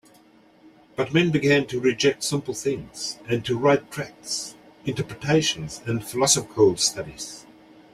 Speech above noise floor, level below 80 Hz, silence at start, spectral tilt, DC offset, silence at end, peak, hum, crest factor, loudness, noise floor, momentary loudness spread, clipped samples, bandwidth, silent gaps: 31 dB; -56 dBFS; 1 s; -4 dB/octave; under 0.1%; 0.5 s; -4 dBFS; none; 20 dB; -23 LUFS; -55 dBFS; 15 LU; under 0.1%; 15.5 kHz; none